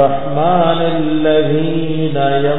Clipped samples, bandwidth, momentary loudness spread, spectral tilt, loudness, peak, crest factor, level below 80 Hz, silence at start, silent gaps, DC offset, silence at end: under 0.1%; 4.1 kHz; 4 LU; -10.5 dB/octave; -14 LUFS; 0 dBFS; 12 dB; -42 dBFS; 0 s; none; 10%; 0 s